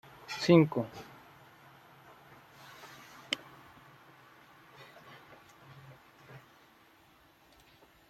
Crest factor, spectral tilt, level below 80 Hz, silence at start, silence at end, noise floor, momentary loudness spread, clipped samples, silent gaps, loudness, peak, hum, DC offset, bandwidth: 26 dB; -6.5 dB/octave; -74 dBFS; 0.3 s; 1.75 s; -63 dBFS; 32 LU; under 0.1%; none; -29 LUFS; -10 dBFS; none; under 0.1%; 13.5 kHz